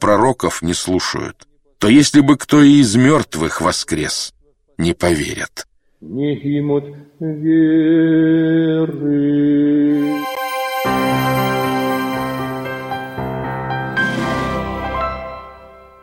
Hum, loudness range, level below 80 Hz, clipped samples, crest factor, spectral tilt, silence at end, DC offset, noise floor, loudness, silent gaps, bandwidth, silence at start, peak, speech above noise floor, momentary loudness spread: none; 8 LU; -42 dBFS; under 0.1%; 16 dB; -5 dB/octave; 0.35 s; under 0.1%; -41 dBFS; -16 LUFS; none; 16.5 kHz; 0 s; 0 dBFS; 26 dB; 13 LU